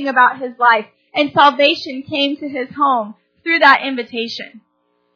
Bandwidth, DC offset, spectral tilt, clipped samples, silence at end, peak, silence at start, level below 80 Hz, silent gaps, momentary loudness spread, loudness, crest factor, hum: 5.4 kHz; under 0.1%; -4 dB/octave; under 0.1%; 0.6 s; 0 dBFS; 0 s; -68 dBFS; none; 14 LU; -15 LUFS; 16 dB; none